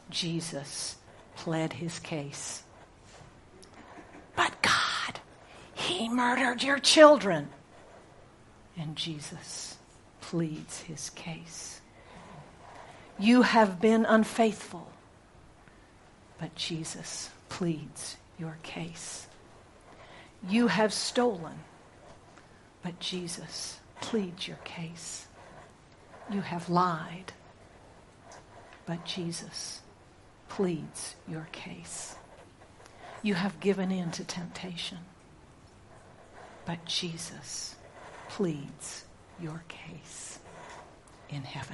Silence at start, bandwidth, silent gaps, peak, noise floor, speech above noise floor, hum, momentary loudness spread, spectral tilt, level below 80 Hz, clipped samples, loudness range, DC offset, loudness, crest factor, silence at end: 0.05 s; 11.5 kHz; none; -4 dBFS; -56 dBFS; 26 dB; none; 24 LU; -4 dB/octave; -64 dBFS; under 0.1%; 14 LU; under 0.1%; -30 LUFS; 28 dB; 0 s